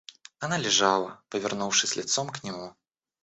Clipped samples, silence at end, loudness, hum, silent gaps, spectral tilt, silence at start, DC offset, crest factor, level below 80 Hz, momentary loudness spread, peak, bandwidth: under 0.1%; 0.55 s; -26 LUFS; none; none; -2 dB/octave; 0.4 s; under 0.1%; 22 dB; -70 dBFS; 15 LU; -6 dBFS; 8.2 kHz